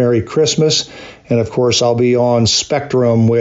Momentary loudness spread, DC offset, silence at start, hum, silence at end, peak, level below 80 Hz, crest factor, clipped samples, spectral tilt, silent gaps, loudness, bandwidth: 5 LU; under 0.1%; 0 s; none; 0 s; -4 dBFS; -48 dBFS; 10 dB; under 0.1%; -4.5 dB/octave; none; -13 LUFS; 8 kHz